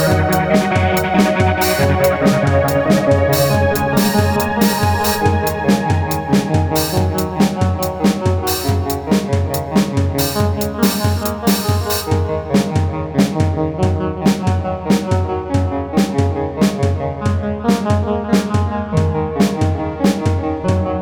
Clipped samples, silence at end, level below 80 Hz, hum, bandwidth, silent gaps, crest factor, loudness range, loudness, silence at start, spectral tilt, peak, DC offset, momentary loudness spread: under 0.1%; 0 s; -34 dBFS; none; over 20 kHz; none; 16 dB; 3 LU; -16 LUFS; 0 s; -6 dB/octave; 0 dBFS; under 0.1%; 5 LU